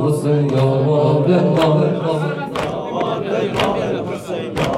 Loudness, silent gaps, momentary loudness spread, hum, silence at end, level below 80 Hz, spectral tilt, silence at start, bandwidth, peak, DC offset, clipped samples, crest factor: -17 LUFS; none; 8 LU; none; 0 s; -46 dBFS; -7.5 dB/octave; 0 s; 13 kHz; -4 dBFS; under 0.1%; under 0.1%; 14 dB